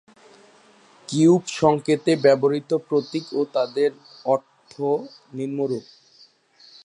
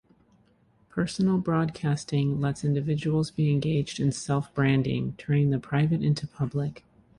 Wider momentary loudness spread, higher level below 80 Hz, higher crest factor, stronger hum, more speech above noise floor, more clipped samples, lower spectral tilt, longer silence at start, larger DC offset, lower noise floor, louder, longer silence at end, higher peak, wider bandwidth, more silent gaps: first, 12 LU vs 6 LU; second, -64 dBFS vs -54 dBFS; about the same, 20 dB vs 16 dB; neither; about the same, 34 dB vs 37 dB; neither; about the same, -6 dB/octave vs -7 dB/octave; first, 1.1 s vs 0.95 s; neither; second, -55 dBFS vs -63 dBFS; first, -22 LUFS vs -27 LUFS; first, 1.05 s vs 0.4 s; first, -4 dBFS vs -12 dBFS; about the same, 10.5 kHz vs 11 kHz; neither